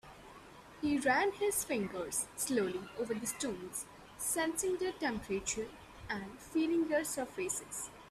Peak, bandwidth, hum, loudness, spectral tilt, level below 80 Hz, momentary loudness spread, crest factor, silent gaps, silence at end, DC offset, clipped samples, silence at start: -18 dBFS; 15.5 kHz; none; -36 LUFS; -3 dB/octave; -64 dBFS; 12 LU; 18 dB; none; 0 s; under 0.1%; under 0.1%; 0.05 s